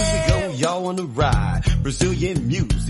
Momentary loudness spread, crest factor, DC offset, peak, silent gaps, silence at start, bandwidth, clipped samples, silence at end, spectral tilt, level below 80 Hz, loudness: 3 LU; 16 dB; under 0.1%; -4 dBFS; none; 0 s; 11.5 kHz; under 0.1%; 0 s; -5.5 dB/octave; -26 dBFS; -21 LUFS